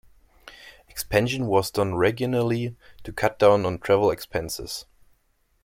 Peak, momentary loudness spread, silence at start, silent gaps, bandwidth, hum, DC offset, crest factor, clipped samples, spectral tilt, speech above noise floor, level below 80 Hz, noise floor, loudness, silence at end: -4 dBFS; 18 LU; 0.45 s; none; 16.5 kHz; none; under 0.1%; 20 dB; under 0.1%; -5.5 dB/octave; 44 dB; -50 dBFS; -67 dBFS; -24 LUFS; 0.8 s